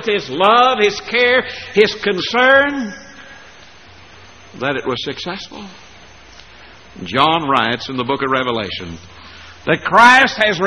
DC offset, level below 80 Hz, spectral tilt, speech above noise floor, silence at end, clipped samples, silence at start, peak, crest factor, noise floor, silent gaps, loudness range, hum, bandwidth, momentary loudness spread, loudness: 0.3%; -50 dBFS; -4 dB/octave; 27 dB; 0 s; under 0.1%; 0 s; 0 dBFS; 16 dB; -42 dBFS; none; 12 LU; none; 11.5 kHz; 18 LU; -14 LUFS